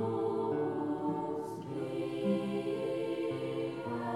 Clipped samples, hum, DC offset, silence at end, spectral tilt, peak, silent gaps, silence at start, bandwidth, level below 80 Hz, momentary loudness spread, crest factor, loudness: under 0.1%; none; under 0.1%; 0 s; -7.5 dB/octave; -22 dBFS; none; 0 s; 12.5 kHz; -72 dBFS; 5 LU; 14 dB; -35 LUFS